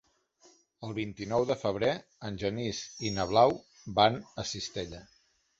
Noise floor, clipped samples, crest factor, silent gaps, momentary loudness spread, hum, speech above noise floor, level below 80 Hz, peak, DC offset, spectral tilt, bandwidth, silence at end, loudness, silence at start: -64 dBFS; under 0.1%; 24 dB; none; 15 LU; none; 34 dB; -58 dBFS; -8 dBFS; under 0.1%; -4.5 dB/octave; 8 kHz; 0.55 s; -31 LUFS; 0.8 s